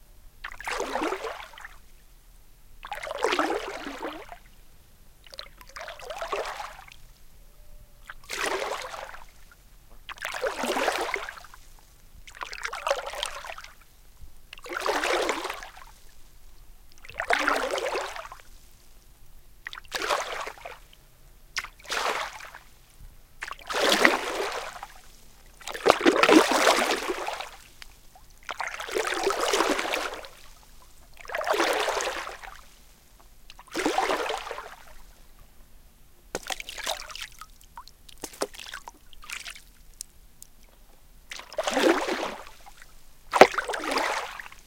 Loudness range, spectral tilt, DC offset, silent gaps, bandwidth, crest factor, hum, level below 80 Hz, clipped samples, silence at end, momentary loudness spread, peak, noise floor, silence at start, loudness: 14 LU; -2 dB/octave; under 0.1%; none; 17 kHz; 30 dB; none; -52 dBFS; under 0.1%; 0.05 s; 25 LU; 0 dBFS; -53 dBFS; 0.1 s; -27 LUFS